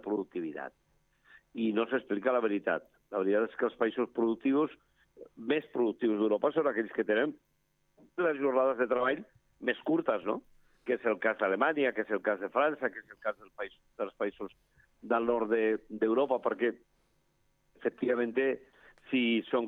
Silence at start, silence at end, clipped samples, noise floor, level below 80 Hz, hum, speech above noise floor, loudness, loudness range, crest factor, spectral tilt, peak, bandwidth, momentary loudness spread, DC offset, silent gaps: 0.05 s; 0 s; under 0.1%; -74 dBFS; -74 dBFS; none; 43 dB; -31 LUFS; 3 LU; 18 dB; -7.5 dB/octave; -14 dBFS; 4 kHz; 11 LU; under 0.1%; none